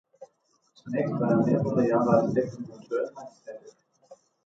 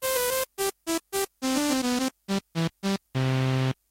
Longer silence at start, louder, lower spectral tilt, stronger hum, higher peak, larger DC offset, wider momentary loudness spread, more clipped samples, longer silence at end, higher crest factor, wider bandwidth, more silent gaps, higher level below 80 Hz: first, 0.2 s vs 0 s; about the same, -26 LUFS vs -28 LUFS; first, -9 dB/octave vs -4.5 dB/octave; neither; first, -10 dBFS vs -14 dBFS; neither; first, 22 LU vs 6 LU; neither; about the same, 0.3 s vs 0.2 s; about the same, 18 dB vs 14 dB; second, 7.8 kHz vs 16.5 kHz; neither; second, -64 dBFS vs -58 dBFS